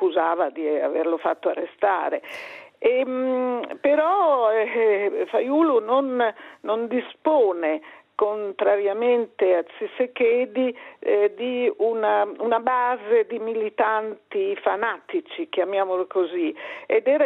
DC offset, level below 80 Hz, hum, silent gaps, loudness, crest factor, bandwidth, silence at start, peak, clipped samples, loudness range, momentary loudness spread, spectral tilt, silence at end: under 0.1%; -76 dBFS; none; none; -23 LUFS; 16 dB; 5.4 kHz; 0 s; -6 dBFS; under 0.1%; 3 LU; 8 LU; -6 dB/octave; 0 s